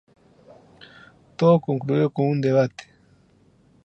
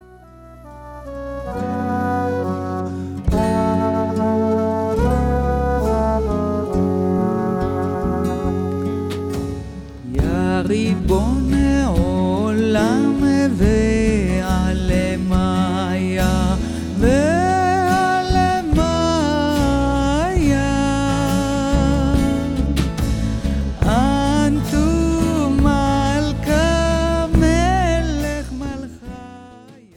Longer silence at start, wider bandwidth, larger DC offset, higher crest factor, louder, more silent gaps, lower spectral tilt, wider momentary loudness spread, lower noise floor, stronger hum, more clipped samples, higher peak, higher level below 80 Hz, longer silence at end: first, 1.4 s vs 0.1 s; second, 8 kHz vs 16.5 kHz; neither; about the same, 20 dB vs 16 dB; second, -21 LUFS vs -18 LUFS; neither; first, -8.5 dB/octave vs -6.5 dB/octave; first, 13 LU vs 8 LU; first, -58 dBFS vs -42 dBFS; neither; neither; about the same, -4 dBFS vs -2 dBFS; second, -66 dBFS vs -26 dBFS; first, 1.05 s vs 0.25 s